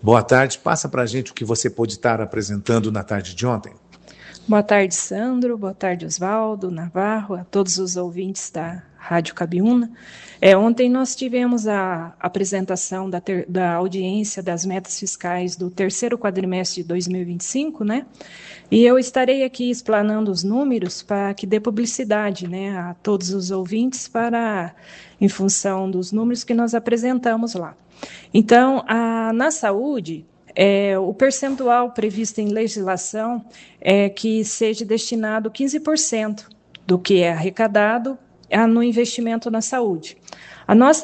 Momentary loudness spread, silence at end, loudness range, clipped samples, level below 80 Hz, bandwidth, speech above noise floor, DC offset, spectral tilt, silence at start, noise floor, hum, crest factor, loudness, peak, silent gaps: 11 LU; 0 s; 4 LU; under 0.1%; -62 dBFS; 9.2 kHz; 25 dB; under 0.1%; -4.5 dB/octave; 0 s; -45 dBFS; none; 20 dB; -20 LUFS; 0 dBFS; none